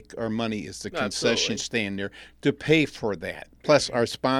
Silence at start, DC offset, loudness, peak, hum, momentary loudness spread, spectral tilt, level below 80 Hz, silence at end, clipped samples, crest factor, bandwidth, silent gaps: 0.1 s; under 0.1%; -25 LUFS; -6 dBFS; none; 11 LU; -4 dB/octave; -54 dBFS; 0 s; under 0.1%; 20 dB; 15 kHz; none